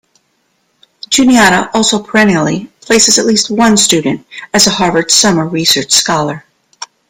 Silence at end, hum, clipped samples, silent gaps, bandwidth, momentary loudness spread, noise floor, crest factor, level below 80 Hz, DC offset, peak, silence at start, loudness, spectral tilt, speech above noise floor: 0.25 s; none; 0.2%; none; over 20 kHz; 12 LU; -60 dBFS; 12 dB; -46 dBFS; under 0.1%; 0 dBFS; 1.1 s; -9 LUFS; -2.5 dB/octave; 50 dB